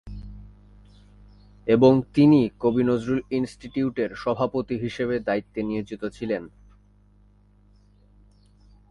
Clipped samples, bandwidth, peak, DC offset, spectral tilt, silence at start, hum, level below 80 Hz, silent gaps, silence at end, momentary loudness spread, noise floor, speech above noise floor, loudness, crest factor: under 0.1%; 11 kHz; -4 dBFS; under 0.1%; -8 dB/octave; 0.05 s; 50 Hz at -55 dBFS; -50 dBFS; none; 2.45 s; 14 LU; -56 dBFS; 34 dB; -23 LUFS; 22 dB